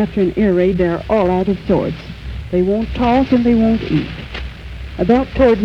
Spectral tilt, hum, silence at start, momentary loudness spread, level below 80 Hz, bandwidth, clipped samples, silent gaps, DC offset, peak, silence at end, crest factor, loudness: -8.5 dB/octave; none; 0 s; 15 LU; -30 dBFS; 7 kHz; under 0.1%; none; under 0.1%; -2 dBFS; 0 s; 14 dB; -16 LUFS